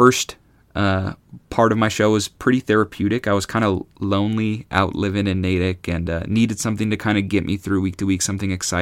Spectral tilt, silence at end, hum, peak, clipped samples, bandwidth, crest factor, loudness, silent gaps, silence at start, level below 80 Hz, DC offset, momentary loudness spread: -5 dB/octave; 0 s; none; 0 dBFS; under 0.1%; 16 kHz; 20 dB; -20 LUFS; none; 0 s; -44 dBFS; under 0.1%; 7 LU